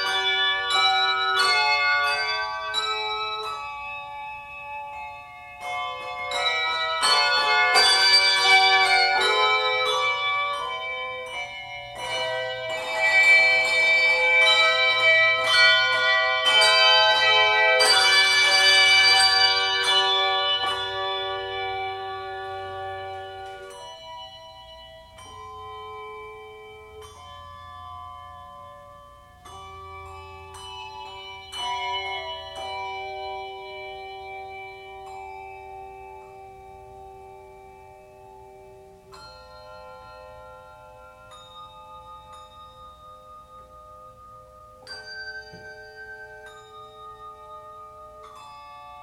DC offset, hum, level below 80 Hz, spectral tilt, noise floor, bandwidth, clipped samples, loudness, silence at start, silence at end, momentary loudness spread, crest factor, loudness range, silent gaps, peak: under 0.1%; none; -58 dBFS; 0 dB/octave; -48 dBFS; 16.5 kHz; under 0.1%; -19 LUFS; 0 s; 0 s; 25 LU; 20 dB; 25 LU; none; -6 dBFS